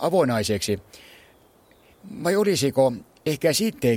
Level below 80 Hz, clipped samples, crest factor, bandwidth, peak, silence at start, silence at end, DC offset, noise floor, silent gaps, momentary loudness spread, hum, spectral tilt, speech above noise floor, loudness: -56 dBFS; under 0.1%; 18 dB; 16.5 kHz; -6 dBFS; 0 s; 0 s; under 0.1%; -56 dBFS; none; 9 LU; none; -4.5 dB/octave; 34 dB; -23 LUFS